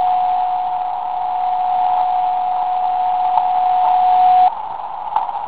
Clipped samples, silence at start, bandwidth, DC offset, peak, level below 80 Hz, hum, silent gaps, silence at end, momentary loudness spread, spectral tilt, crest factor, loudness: under 0.1%; 0 s; 4 kHz; 1%; 0 dBFS; -56 dBFS; none; none; 0 s; 9 LU; -6 dB/octave; 16 dB; -17 LUFS